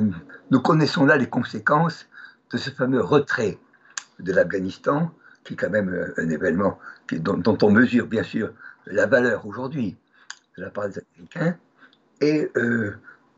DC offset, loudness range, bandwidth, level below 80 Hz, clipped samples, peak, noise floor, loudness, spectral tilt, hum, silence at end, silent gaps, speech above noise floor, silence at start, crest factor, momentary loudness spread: under 0.1%; 5 LU; 8 kHz; -62 dBFS; under 0.1%; -4 dBFS; -56 dBFS; -22 LUFS; -6.5 dB/octave; none; 0.3 s; none; 34 dB; 0 s; 20 dB; 19 LU